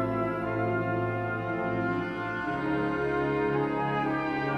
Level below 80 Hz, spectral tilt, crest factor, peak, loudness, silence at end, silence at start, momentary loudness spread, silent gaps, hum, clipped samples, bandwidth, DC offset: -54 dBFS; -8.5 dB/octave; 14 dB; -16 dBFS; -29 LUFS; 0 s; 0 s; 4 LU; none; none; under 0.1%; 11.5 kHz; under 0.1%